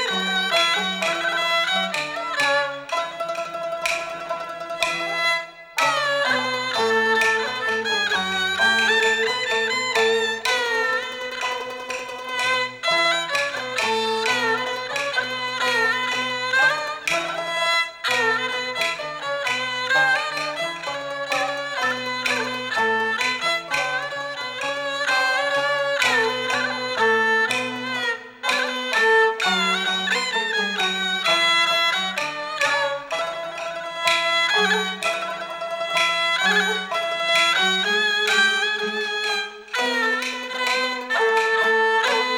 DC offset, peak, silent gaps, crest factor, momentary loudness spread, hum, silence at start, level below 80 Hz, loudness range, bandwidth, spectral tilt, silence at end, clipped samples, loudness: under 0.1%; -4 dBFS; none; 20 dB; 9 LU; none; 0 s; -64 dBFS; 3 LU; 19 kHz; -1.5 dB/octave; 0 s; under 0.1%; -21 LUFS